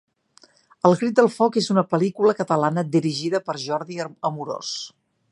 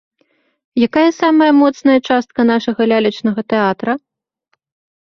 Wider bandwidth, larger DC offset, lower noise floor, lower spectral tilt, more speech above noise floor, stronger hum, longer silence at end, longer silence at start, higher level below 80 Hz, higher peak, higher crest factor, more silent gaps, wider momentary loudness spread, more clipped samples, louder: first, 11.5 kHz vs 7 kHz; neither; second, -57 dBFS vs -68 dBFS; about the same, -6 dB/octave vs -6 dB/octave; second, 35 dB vs 55 dB; neither; second, 0.45 s vs 1.1 s; about the same, 0.85 s vs 0.75 s; second, -72 dBFS vs -58 dBFS; about the same, -2 dBFS vs -2 dBFS; first, 20 dB vs 14 dB; neither; about the same, 11 LU vs 9 LU; neither; second, -22 LUFS vs -14 LUFS